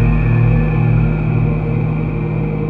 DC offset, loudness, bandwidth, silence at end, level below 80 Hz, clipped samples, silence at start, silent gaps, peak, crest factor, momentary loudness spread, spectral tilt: under 0.1%; -16 LUFS; 4 kHz; 0 s; -22 dBFS; under 0.1%; 0 s; none; -2 dBFS; 12 dB; 5 LU; -11.5 dB/octave